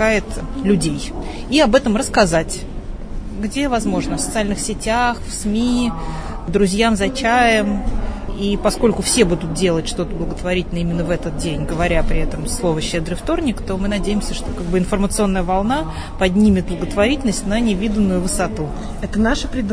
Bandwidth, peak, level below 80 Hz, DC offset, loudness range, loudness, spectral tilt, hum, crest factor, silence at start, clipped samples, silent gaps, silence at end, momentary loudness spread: 11 kHz; 0 dBFS; -26 dBFS; 0.4%; 3 LU; -19 LUFS; -5 dB/octave; none; 18 dB; 0 s; under 0.1%; none; 0 s; 11 LU